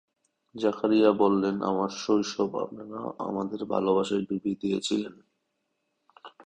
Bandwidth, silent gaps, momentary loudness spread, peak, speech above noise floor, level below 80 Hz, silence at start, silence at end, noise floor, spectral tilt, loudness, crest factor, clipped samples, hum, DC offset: 9.6 kHz; none; 13 LU; -8 dBFS; 52 dB; -66 dBFS; 0.55 s; 0.05 s; -78 dBFS; -5.5 dB/octave; -27 LUFS; 20 dB; under 0.1%; none; under 0.1%